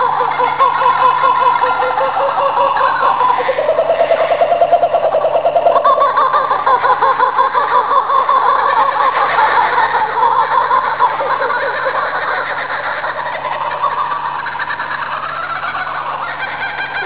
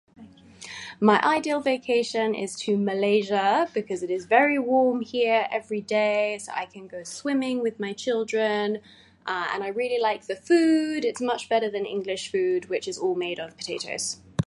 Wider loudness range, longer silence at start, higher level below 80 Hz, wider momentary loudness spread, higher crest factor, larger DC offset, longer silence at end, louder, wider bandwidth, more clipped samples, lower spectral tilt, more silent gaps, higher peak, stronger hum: first, 7 LU vs 4 LU; second, 0 s vs 0.2 s; first, -52 dBFS vs -64 dBFS; second, 8 LU vs 11 LU; second, 14 dB vs 20 dB; first, 0.8% vs under 0.1%; about the same, 0 s vs 0 s; first, -14 LUFS vs -25 LUFS; second, 4 kHz vs 11.5 kHz; neither; first, -7 dB/octave vs -4.5 dB/octave; neither; first, 0 dBFS vs -4 dBFS; neither